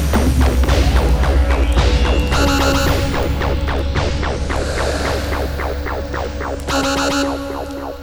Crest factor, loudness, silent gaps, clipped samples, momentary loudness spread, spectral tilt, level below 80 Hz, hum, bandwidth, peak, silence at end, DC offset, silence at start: 16 dB; -18 LUFS; none; under 0.1%; 8 LU; -5.5 dB/octave; -18 dBFS; none; over 20 kHz; 0 dBFS; 0 s; under 0.1%; 0 s